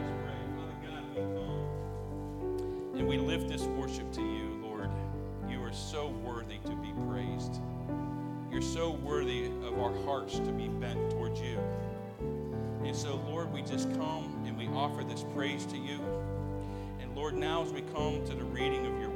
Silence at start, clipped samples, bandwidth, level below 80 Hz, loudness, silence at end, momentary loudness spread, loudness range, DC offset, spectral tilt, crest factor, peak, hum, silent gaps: 0 s; under 0.1%; 17 kHz; -48 dBFS; -36 LUFS; 0 s; 6 LU; 3 LU; under 0.1%; -6 dB/octave; 16 dB; -18 dBFS; none; none